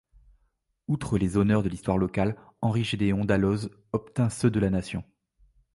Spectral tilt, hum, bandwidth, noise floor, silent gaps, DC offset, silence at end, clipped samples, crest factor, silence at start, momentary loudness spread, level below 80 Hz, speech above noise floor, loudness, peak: -7 dB/octave; none; 11.5 kHz; -72 dBFS; none; under 0.1%; 0.75 s; under 0.1%; 18 dB; 0.9 s; 8 LU; -46 dBFS; 47 dB; -27 LUFS; -10 dBFS